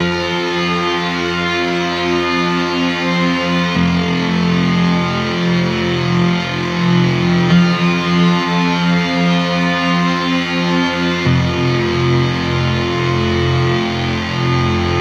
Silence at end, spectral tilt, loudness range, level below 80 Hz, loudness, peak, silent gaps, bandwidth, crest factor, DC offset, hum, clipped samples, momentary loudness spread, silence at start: 0 s; -6 dB/octave; 2 LU; -40 dBFS; -15 LUFS; -2 dBFS; none; 8 kHz; 14 dB; under 0.1%; none; under 0.1%; 3 LU; 0 s